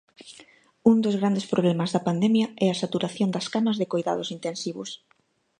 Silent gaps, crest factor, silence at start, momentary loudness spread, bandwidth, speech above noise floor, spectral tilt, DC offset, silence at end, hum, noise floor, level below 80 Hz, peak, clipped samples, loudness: none; 20 dB; 0.2 s; 11 LU; 10 kHz; 30 dB; -6 dB/octave; under 0.1%; 0.65 s; none; -54 dBFS; -70 dBFS; -6 dBFS; under 0.1%; -25 LUFS